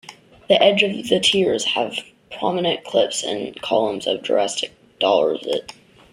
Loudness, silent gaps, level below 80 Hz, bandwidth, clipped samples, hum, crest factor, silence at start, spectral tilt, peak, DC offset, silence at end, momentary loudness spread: -20 LUFS; none; -62 dBFS; 14.5 kHz; under 0.1%; none; 20 dB; 0.1 s; -3 dB/octave; 0 dBFS; under 0.1%; 0.4 s; 11 LU